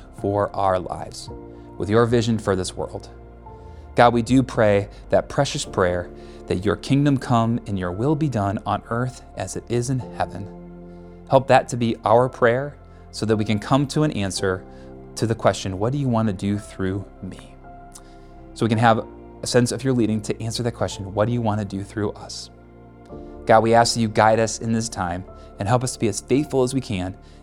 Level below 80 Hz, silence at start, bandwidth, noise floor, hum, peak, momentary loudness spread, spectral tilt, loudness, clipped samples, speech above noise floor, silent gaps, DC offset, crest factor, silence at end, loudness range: -44 dBFS; 0 s; 14 kHz; -45 dBFS; none; 0 dBFS; 20 LU; -5.5 dB/octave; -22 LUFS; under 0.1%; 24 dB; none; under 0.1%; 22 dB; 0.25 s; 5 LU